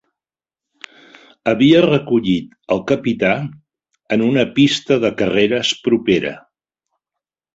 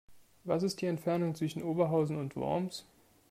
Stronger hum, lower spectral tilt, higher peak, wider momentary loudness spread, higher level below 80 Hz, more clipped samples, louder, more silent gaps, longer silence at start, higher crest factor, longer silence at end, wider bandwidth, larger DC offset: neither; second, -5.5 dB/octave vs -7 dB/octave; first, -2 dBFS vs -16 dBFS; about the same, 9 LU vs 8 LU; first, -52 dBFS vs -70 dBFS; neither; first, -16 LUFS vs -33 LUFS; neither; first, 1.45 s vs 0.1 s; about the same, 16 dB vs 18 dB; first, 1.15 s vs 0.5 s; second, 8 kHz vs 15.5 kHz; neither